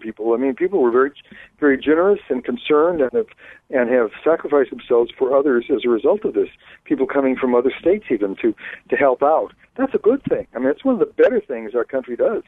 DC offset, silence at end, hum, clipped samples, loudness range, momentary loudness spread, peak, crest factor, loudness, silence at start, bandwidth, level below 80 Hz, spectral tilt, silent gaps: under 0.1%; 0.05 s; none; under 0.1%; 1 LU; 8 LU; -4 dBFS; 16 dB; -19 LUFS; 0 s; 4 kHz; -56 dBFS; -8.5 dB/octave; none